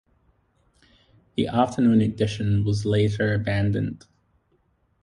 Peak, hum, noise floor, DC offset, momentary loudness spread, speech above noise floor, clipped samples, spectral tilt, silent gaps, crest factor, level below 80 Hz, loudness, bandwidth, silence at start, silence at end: -6 dBFS; none; -67 dBFS; under 0.1%; 9 LU; 45 dB; under 0.1%; -7.5 dB/octave; none; 20 dB; -46 dBFS; -23 LUFS; 10.5 kHz; 1.4 s; 1.05 s